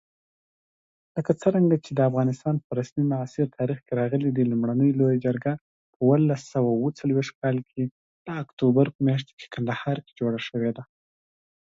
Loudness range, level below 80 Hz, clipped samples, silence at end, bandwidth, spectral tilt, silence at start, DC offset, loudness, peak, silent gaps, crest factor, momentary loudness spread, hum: 3 LU; -64 dBFS; under 0.1%; 0.75 s; 7.8 kHz; -8.5 dB/octave; 1.15 s; under 0.1%; -25 LUFS; -6 dBFS; 2.64-2.70 s, 5.61-6.00 s, 7.35-7.42 s, 7.91-8.25 s, 8.53-8.57 s, 8.95-8.99 s, 9.33-9.37 s; 18 dB; 10 LU; none